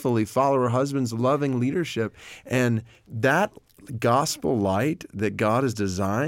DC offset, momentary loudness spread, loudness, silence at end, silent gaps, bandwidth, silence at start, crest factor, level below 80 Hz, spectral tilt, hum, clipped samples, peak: under 0.1%; 8 LU; -24 LUFS; 0 s; none; 17 kHz; 0 s; 16 dB; -60 dBFS; -6 dB/octave; none; under 0.1%; -8 dBFS